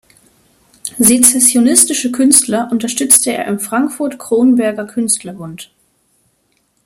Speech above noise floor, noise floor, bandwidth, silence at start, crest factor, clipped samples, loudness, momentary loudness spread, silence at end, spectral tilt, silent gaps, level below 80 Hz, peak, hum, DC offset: 48 dB; -61 dBFS; over 20 kHz; 0.85 s; 14 dB; 0.3%; -11 LUFS; 15 LU; 1.2 s; -2.5 dB/octave; none; -54 dBFS; 0 dBFS; none; under 0.1%